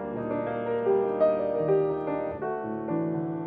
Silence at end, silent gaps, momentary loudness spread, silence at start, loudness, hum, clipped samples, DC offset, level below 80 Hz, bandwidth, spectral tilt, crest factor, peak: 0 s; none; 7 LU; 0 s; -28 LUFS; none; under 0.1%; under 0.1%; -60 dBFS; 4.8 kHz; -11.5 dB/octave; 14 dB; -12 dBFS